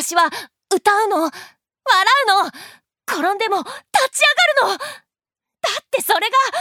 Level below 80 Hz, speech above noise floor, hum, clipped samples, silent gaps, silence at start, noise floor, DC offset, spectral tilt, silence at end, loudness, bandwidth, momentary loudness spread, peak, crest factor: -74 dBFS; 69 dB; none; under 0.1%; none; 0 s; -87 dBFS; under 0.1%; 0 dB/octave; 0 s; -17 LUFS; 19 kHz; 12 LU; -2 dBFS; 18 dB